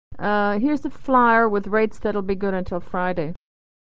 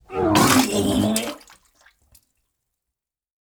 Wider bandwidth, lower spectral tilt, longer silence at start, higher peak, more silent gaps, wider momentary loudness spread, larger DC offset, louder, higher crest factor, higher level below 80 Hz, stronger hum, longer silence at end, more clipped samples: second, 8 kHz vs over 20 kHz; first, -8 dB/octave vs -4 dB/octave; about the same, 0.1 s vs 0.1 s; second, -6 dBFS vs -2 dBFS; neither; second, 11 LU vs 14 LU; first, 3% vs under 0.1%; about the same, -21 LUFS vs -19 LUFS; about the same, 16 dB vs 20 dB; about the same, -44 dBFS vs -48 dBFS; neither; second, 0.45 s vs 2.1 s; neither